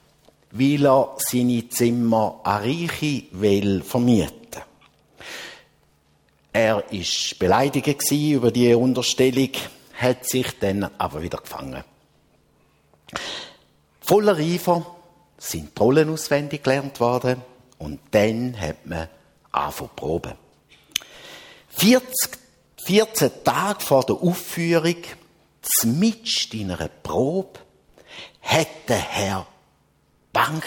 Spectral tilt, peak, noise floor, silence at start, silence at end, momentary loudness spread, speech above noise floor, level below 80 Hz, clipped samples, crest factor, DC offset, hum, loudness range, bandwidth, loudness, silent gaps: -4.5 dB/octave; -4 dBFS; -62 dBFS; 0.55 s; 0 s; 18 LU; 41 dB; -52 dBFS; under 0.1%; 18 dB; under 0.1%; none; 6 LU; 17.5 kHz; -22 LUFS; none